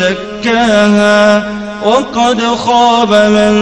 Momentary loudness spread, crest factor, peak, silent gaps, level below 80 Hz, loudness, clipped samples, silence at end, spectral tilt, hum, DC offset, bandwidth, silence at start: 7 LU; 10 dB; 0 dBFS; none; -40 dBFS; -9 LUFS; under 0.1%; 0 s; -4.5 dB/octave; none; under 0.1%; 10.5 kHz; 0 s